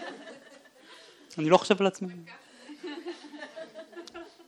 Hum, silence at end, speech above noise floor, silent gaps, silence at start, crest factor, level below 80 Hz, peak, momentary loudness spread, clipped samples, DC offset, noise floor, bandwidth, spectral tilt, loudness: none; 0.2 s; 28 dB; none; 0 s; 26 dB; -80 dBFS; -6 dBFS; 26 LU; under 0.1%; under 0.1%; -54 dBFS; 11.5 kHz; -5 dB/octave; -27 LUFS